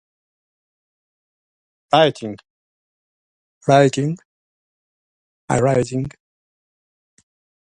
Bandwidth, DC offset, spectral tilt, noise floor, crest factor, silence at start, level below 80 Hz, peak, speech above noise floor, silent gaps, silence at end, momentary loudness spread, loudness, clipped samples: 11 kHz; under 0.1%; -5.5 dB/octave; under -90 dBFS; 22 dB; 1.9 s; -56 dBFS; 0 dBFS; over 73 dB; 2.50-3.61 s, 4.25-5.48 s; 1.55 s; 18 LU; -18 LUFS; under 0.1%